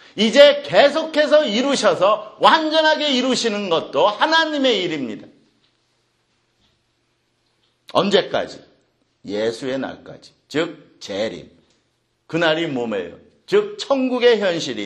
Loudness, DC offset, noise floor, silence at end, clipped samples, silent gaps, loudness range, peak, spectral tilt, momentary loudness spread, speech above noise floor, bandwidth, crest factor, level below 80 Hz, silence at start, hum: -18 LUFS; under 0.1%; -67 dBFS; 0 s; under 0.1%; none; 11 LU; 0 dBFS; -3.5 dB/octave; 13 LU; 49 dB; 10 kHz; 20 dB; -66 dBFS; 0.15 s; none